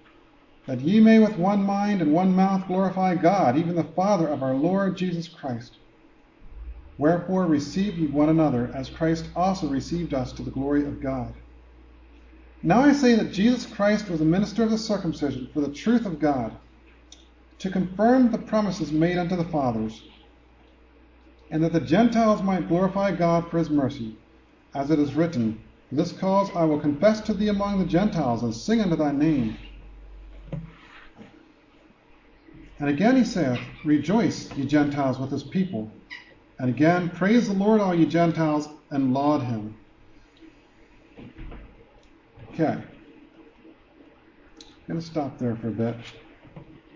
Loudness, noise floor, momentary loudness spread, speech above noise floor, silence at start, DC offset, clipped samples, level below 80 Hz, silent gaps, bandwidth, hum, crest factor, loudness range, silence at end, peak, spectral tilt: -23 LUFS; -56 dBFS; 14 LU; 33 dB; 0.65 s; under 0.1%; under 0.1%; -50 dBFS; none; 7.4 kHz; none; 18 dB; 11 LU; 0.3 s; -6 dBFS; -7 dB/octave